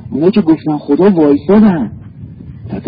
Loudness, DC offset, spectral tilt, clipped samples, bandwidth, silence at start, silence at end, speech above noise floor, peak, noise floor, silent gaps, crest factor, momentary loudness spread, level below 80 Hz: -10 LUFS; under 0.1%; -12 dB/octave; under 0.1%; 5.2 kHz; 0 s; 0 s; 21 dB; 0 dBFS; -30 dBFS; none; 12 dB; 22 LU; -40 dBFS